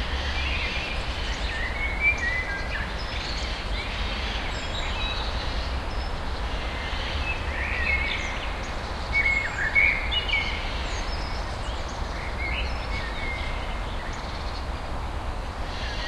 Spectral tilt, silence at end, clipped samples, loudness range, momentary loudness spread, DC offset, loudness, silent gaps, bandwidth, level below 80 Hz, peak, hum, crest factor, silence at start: -4 dB/octave; 0 s; under 0.1%; 7 LU; 10 LU; under 0.1%; -28 LUFS; none; 12 kHz; -32 dBFS; -8 dBFS; none; 18 dB; 0 s